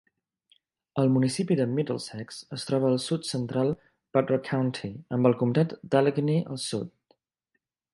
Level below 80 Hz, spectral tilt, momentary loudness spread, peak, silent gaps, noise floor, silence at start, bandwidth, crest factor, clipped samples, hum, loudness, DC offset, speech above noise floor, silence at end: -68 dBFS; -6.5 dB/octave; 12 LU; -6 dBFS; none; -80 dBFS; 0.95 s; 11.5 kHz; 22 dB; under 0.1%; none; -27 LUFS; under 0.1%; 54 dB; 1.05 s